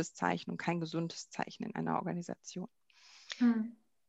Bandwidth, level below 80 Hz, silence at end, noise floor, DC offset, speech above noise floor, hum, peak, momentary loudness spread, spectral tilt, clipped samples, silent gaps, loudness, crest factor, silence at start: 8.2 kHz; -80 dBFS; 0.35 s; -61 dBFS; under 0.1%; 25 dB; none; -14 dBFS; 15 LU; -5.5 dB/octave; under 0.1%; none; -37 LUFS; 22 dB; 0 s